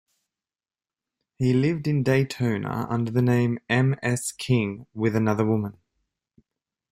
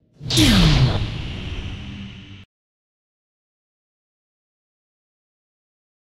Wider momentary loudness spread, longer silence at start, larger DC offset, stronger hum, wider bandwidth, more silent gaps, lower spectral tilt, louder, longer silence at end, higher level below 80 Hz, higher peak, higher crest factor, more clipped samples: second, 6 LU vs 22 LU; first, 1.4 s vs 0.2 s; neither; neither; about the same, 15 kHz vs 16 kHz; neither; first, -6.5 dB/octave vs -4.5 dB/octave; second, -24 LUFS vs -18 LUFS; second, 1.2 s vs 3.6 s; second, -58 dBFS vs -32 dBFS; second, -8 dBFS vs -2 dBFS; about the same, 18 dB vs 22 dB; neither